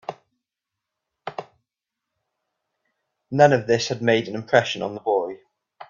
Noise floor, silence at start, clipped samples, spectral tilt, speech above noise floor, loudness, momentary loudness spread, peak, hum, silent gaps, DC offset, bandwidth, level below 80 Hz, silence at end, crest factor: -85 dBFS; 0.1 s; under 0.1%; -5 dB/octave; 65 dB; -21 LUFS; 21 LU; -2 dBFS; none; none; under 0.1%; 7.4 kHz; -66 dBFS; 0.05 s; 24 dB